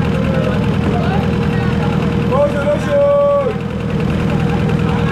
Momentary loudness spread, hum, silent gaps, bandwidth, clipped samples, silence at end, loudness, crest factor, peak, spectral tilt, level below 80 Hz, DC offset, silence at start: 4 LU; none; none; 11.5 kHz; under 0.1%; 0 s; -15 LUFS; 10 dB; -4 dBFS; -8 dB/octave; -32 dBFS; under 0.1%; 0 s